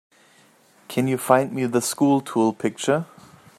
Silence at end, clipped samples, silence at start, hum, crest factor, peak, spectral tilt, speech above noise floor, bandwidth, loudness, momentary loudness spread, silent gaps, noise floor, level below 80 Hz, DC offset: 0.55 s; under 0.1%; 0.9 s; none; 22 dB; -2 dBFS; -5 dB/octave; 35 dB; 14.5 kHz; -22 LUFS; 6 LU; none; -56 dBFS; -68 dBFS; under 0.1%